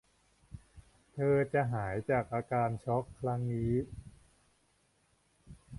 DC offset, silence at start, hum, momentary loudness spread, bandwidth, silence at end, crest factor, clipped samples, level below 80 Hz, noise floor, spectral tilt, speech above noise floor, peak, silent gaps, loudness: under 0.1%; 0.5 s; none; 23 LU; 11.5 kHz; 0 s; 18 dB; under 0.1%; -58 dBFS; -72 dBFS; -9 dB/octave; 40 dB; -18 dBFS; none; -33 LUFS